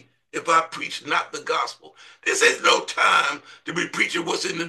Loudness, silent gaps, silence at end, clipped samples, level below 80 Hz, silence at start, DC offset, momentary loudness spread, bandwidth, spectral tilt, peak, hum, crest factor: -21 LUFS; none; 0 s; under 0.1%; -74 dBFS; 0.35 s; under 0.1%; 13 LU; 12.5 kHz; -1.5 dB/octave; -4 dBFS; none; 20 dB